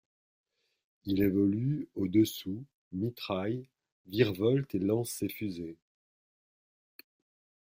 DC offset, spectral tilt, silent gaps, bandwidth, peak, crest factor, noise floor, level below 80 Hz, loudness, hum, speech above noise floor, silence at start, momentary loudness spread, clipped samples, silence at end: under 0.1%; -6.5 dB/octave; 2.74-2.91 s, 3.92-4.04 s; 16 kHz; -12 dBFS; 20 dB; under -90 dBFS; -66 dBFS; -31 LUFS; none; over 59 dB; 1.05 s; 14 LU; under 0.1%; 1.95 s